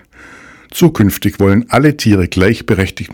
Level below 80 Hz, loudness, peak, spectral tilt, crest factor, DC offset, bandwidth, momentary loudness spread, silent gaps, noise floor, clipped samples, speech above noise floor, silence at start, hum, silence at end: -36 dBFS; -12 LUFS; 0 dBFS; -6 dB/octave; 12 dB; under 0.1%; 19 kHz; 4 LU; none; -38 dBFS; 1%; 27 dB; 0.7 s; none; 0.05 s